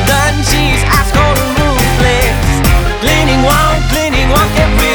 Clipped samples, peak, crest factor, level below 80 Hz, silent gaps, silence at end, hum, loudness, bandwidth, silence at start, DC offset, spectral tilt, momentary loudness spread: under 0.1%; 0 dBFS; 10 dB; -14 dBFS; none; 0 s; none; -10 LUFS; over 20 kHz; 0 s; under 0.1%; -4.5 dB/octave; 2 LU